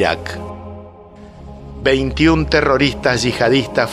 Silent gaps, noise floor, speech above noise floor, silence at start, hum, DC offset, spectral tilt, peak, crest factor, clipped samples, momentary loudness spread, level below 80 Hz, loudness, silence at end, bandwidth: none; -38 dBFS; 23 dB; 0 s; none; under 0.1%; -5 dB/octave; 0 dBFS; 16 dB; under 0.1%; 21 LU; -32 dBFS; -15 LUFS; 0 s; 13.5 kHz